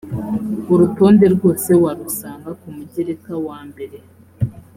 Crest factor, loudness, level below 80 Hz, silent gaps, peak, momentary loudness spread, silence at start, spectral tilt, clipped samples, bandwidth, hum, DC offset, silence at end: 16 dB; -16 LUFS; -50 dBFS; none; -2 dBFS; 21 LU; 0.05 s; -7.5 dB/octave; under 0.1%; 16.5 kHz; none; under 0.1%; 0.15 s